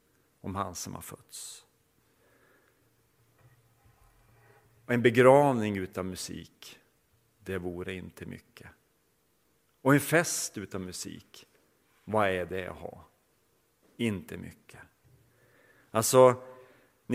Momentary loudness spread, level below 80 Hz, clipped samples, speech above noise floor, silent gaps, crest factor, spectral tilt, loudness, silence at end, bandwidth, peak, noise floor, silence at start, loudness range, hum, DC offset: 25 LU; -66 dBFS; under 0.1%; 43 dB; none; 24 dB; -5 dB/octave; -28 LUFS; 0 s; 16.5 kHz; -6 dBFS; -71 dBFS; 0.45 s; 15 LU; none; under 0.1%